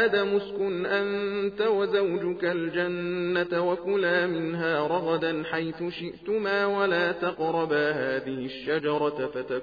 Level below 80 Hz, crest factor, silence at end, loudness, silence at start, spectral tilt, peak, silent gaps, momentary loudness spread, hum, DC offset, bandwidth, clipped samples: -64 dBFS; 14 dB; 0 s; -27 LUFS; 0 s; -3.5 dB/octave; -12 dBFS; none; 6 LU; none; under 0.1%; 6.8 kHz; under 0.1%